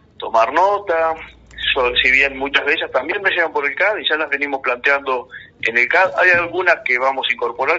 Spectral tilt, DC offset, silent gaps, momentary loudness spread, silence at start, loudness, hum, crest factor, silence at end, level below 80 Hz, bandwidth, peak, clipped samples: 1 dB/octave; under 0.1%; none; 8 LU; 0.2 s; -16 LUFS; none; 16 dB; 0 s; -48 dBFS; 7.8 kHz; 0 dBFS; under 0.1%